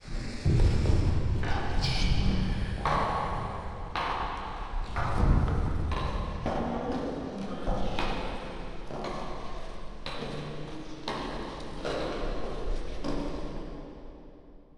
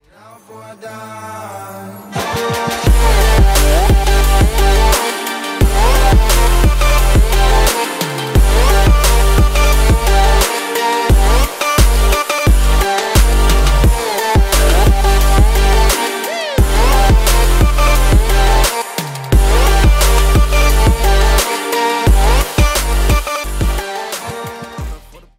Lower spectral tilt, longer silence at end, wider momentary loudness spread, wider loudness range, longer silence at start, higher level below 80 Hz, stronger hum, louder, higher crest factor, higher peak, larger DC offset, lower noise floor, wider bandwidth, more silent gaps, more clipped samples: first, -6.5 dB/octave vs -4 dB/octave; second, 0.15 s vs 0.4 s; first, 14 LU vs 11 LU; first, 8 LU vs 2 LU; second, 0 s vs 0.5 s; second, -34 dBFS vs -12 dBFS; neither; second, -32 LUFS vs -13 LUFS; first, 18 dB vs 10 dB; second, -10 dBFS vs 0 dBFS; neither; first, -50 dBFS vs -42 dBFS; second, 11 kHz vs 16.5 kHz; neither; neither